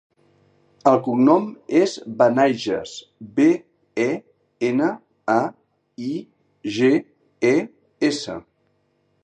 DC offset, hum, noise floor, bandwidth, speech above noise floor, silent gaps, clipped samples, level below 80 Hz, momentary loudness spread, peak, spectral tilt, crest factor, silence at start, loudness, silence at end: under 0.1%; none; -66 dBFS; 9.4 kHz; 47 dB; none; under 0.1%; -66 dBFS; 15 LU; -2 dBFS; -5.5 dB/octave; 20 dB; 0.85 s; -21 LUFS; 0.85 s